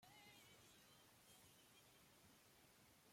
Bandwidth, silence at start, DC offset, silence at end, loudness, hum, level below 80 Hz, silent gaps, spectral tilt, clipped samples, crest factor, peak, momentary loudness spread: 16.5 kHz; 0 s; under 0.1%; 0 s; -68 LUFS; none; -90 dBFS; none; -2.5 dB/octave; under 0.1%; 16 dB; -54 dBFS; 4 LU